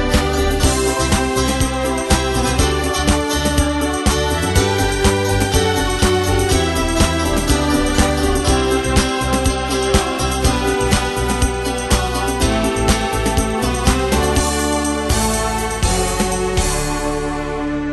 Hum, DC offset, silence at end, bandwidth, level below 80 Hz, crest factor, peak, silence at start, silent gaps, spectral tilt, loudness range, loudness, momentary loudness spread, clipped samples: none; under 0.1%; 0 s; 12.5 kHz; -22 dBFS; 16 dB; 0 dBFS; 0 s; none; -4 dB/octave; 1 LU; -17 LUFS; 3 LU; under 0.1%